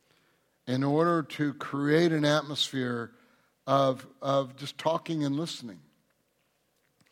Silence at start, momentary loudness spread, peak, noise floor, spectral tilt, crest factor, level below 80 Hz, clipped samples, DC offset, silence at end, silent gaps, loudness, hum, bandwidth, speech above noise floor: 0.65 s; 13 LU; -12 dBFS; -73 dBFS; -5.5 dB/octave; 18 dB; -76 dBFS; under 0.1%; under 0.1%; 1.35 s; none; -28 LUFS; none; 16 kHz; 45 dB